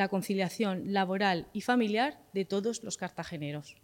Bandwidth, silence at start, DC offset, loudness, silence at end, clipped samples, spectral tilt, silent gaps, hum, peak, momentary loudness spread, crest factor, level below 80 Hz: 17 kHz; 0 s; under 0.1%; -32 LUFS; 0.1 s; under 0.1%; -5 dB/octave; none; none; -14 dBFS; 10 LU; 16 dB; -68 dBFS